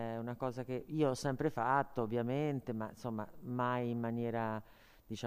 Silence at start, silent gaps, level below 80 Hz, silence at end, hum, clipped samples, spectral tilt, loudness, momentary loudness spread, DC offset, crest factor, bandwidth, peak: 0 s; none; -66 dBFS; 0 s; none; under 0.1%; -7 dB/octave; -38 LUFS; 9 LU; under 0.1%; 18 dB; 15 kHz; -18 dBFS